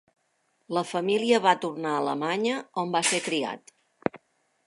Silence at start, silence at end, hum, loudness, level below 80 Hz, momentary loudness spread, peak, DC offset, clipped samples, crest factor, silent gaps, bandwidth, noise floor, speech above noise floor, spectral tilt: 0.7 s; 0.5 s; none; -26 LUFS; -76 dBFS; 12 LU; -6 dBFS; under 0.1%; under 0.1%; 22 dB; none; 11.5 kHz; -72 dBFS; 46 dB; -3.5 dB/octave